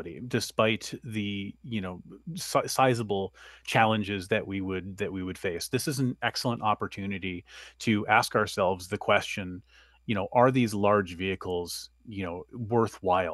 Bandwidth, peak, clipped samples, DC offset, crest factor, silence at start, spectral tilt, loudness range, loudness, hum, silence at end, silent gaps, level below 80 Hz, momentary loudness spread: 12.5 kHz; -6 dBFS; under 0.1%; under 0.1%; 22 dB; 0 s; -5 dB/octave; 4 LU; -29 LUFS; none; 0 s; none; -60 dBFS; 14 LU